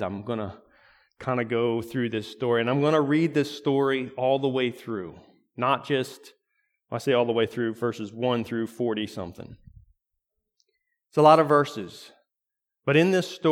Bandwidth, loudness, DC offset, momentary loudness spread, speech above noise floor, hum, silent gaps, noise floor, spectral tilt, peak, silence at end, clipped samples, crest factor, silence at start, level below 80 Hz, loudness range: 16 kHz; -25 LUFS; under 0.1%; 15 LU; 62 dB; none; none; -87 dBFS; -6.5 dB/octave; -4 dBFS; 0 s; under 0.1%; 22 dB; 0 s; -66 dBFS; 5 LU